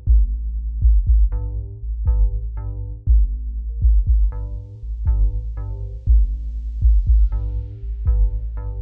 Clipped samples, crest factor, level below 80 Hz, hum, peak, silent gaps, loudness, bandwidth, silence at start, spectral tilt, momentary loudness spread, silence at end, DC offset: under 0.1%; 12 dB; -18 dBFS; none; -6 dBFS; none; -22 LUFS; 1.4 kHz; 0 s; -11.5 dB/octave; 12 LU; 0 s; under 0.1%